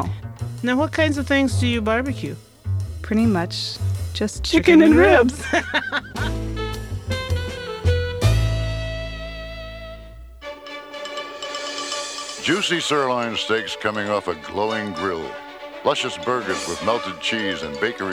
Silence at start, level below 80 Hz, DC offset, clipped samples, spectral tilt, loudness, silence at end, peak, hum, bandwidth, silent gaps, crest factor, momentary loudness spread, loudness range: 0 s; -36 dBFS; under 0.1%; under 0.1%; -5 dB/octave; -21 LUFS; 0 s; -2 dBFS; none; 15.5 kHz; none; 20 dB; 14 LU; 9 LU